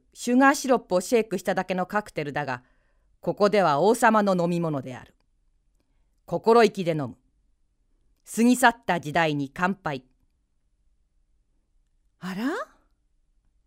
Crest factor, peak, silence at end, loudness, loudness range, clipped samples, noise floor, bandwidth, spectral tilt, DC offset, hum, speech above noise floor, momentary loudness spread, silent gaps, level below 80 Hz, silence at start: 22 dB; -4 dBFS; 1 s; -24 LUFS; 10 LU; under 0.1%; -69 dBFS; 16 kHz; -5 dB/octave; under 0.1%; none; 46 dB; 15 LU; none; -62 dBFS; 0.2 s